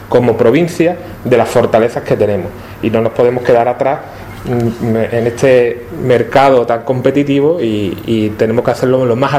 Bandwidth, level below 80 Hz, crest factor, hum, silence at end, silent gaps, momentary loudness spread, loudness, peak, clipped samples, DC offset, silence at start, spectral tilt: 15.5 kHz; -42 dBFS; 12 dB; none; 0 s; none; 8 LU; -12 LUFS; 0 dBFS; under 0.1%; under 0.1%; 0 s; -7 dB/octave